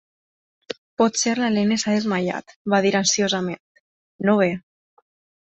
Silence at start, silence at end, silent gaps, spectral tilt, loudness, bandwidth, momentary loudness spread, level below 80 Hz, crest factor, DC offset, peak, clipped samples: 0.7 s; 0.9 s; 0.78-0.97 s, 2.56-2.65 s, 3.60-4.19 s; -4 dB/octave; -21 LUFS; 8.2 kHz; 15 LU; -64 dBFS; 18 dB; under 0.1%; -6 dBFS; under 0.1%